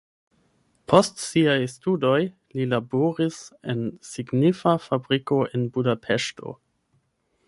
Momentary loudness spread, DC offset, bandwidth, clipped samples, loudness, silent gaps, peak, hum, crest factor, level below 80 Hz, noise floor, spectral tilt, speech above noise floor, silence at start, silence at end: 11 LU; under 0.1%; 11.5 kHz; under 0.1%; -23 LUFS; none; -2 dBFS; none; 22 dB; -64 dBFS; -70 dBFS; -5.5 dB/octave; 47 dB; 0.9 s; 0.95 s